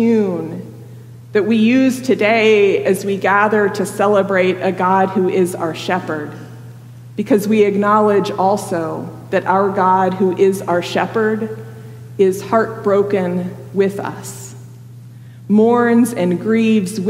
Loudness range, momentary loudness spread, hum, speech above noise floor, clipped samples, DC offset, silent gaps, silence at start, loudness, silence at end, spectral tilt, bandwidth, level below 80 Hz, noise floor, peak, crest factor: 4 LU; 17 LU; none; 21 dB; under 0.1%; under 0.1%; none; 0 s; -15 LUFS; 0 s; -6 dB/octave; 16 kHz; -62 dBFS; -36 dBFS; -2 dBFS; 14 dB